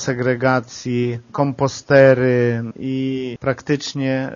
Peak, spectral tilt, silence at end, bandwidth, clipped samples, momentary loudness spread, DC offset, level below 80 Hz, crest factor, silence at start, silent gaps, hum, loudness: 0 dBFS; -6 dB/octave; 0 s; 7.4 kHz; under 0.1%; 11 LU; under 0.1%; -54 dBFS; 18 dB; 0 s; none; none; -18 LUFS